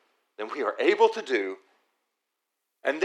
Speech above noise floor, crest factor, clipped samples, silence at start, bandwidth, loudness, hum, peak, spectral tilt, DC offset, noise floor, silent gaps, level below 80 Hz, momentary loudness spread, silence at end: 57 dB; 22 dB; under 0.1%; 0.4 s; 9.8 kHz; -26 LUFS; none; -6 dBFS; -3 dB/octave; under 0.1%; -82 dBFS; none; under -90 dBFS; 16 LU; 0 s